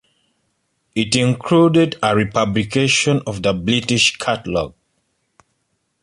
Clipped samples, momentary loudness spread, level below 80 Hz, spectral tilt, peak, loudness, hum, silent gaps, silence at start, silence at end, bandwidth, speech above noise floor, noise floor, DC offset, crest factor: under 0.1%; 9 LU; -46 dBFS; -4.5 dB/octave; -2 dBFS; -17 LUFS; none; none; 0.95 s; 1.35 s; 11.5 kHz; 53 dB; -69 dBFS; under 0.1%; 18 dB